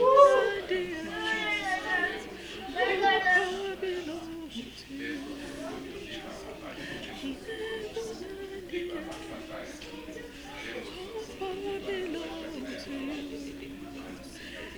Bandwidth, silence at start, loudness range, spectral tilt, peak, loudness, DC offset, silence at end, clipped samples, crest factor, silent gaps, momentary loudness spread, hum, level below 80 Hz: over 20 kHz; 0 s; 11 LU; -3.5 dB/octave; -6 dBFS; -31 LUFS; under 0.1%; 0 s; under 0.1%; 24 dB; none; 17 LU; none; -56 dBFS